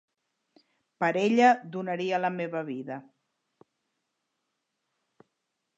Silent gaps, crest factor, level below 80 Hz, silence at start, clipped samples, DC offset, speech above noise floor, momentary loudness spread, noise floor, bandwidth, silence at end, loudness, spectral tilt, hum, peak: none; 20 dB; -86 dBFS; 1 s; under 0.1%; under 0.1%; 55 dB; 16 LU; -82 dBFS; 7.8 kHz; 2.75 s; -27 LUFS; -6 dB/octave; none; -10 dBFS